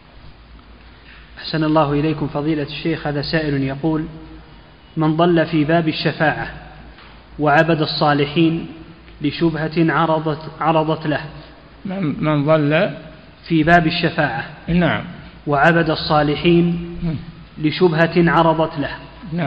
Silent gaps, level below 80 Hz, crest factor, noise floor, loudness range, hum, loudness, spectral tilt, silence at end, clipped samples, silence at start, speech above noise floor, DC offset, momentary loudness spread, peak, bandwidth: none; -42 dBFS; 18 dB; -43 dBFS; 3 LU; none; -18 LUFS; -8.5 dB/octave; 0 s; under 0.1%; 0.25 s; 26 dB; 0.1%; 14 LU; 0 dBFS; 5.8 kHz